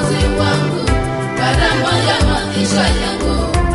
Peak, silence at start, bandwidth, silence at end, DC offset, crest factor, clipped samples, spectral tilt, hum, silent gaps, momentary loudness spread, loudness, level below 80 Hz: -2 dBFS; 0 s; 11.5 kHz; 0 s; under 0.1%; 12 dB; under 0.1%; -5 dB/octave; none; none; 4 LU; -15 LUFS; -22 dBFS